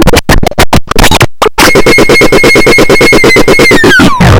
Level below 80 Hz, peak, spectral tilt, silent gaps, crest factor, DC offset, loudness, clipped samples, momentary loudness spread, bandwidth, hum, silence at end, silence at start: -14 dBFS; 0 dBFS; -4 dB/octave; none; 4 dB; 20%; -3 LUFS; 20%; 5 LU; over 20 kHz; none; 0 s; 0 s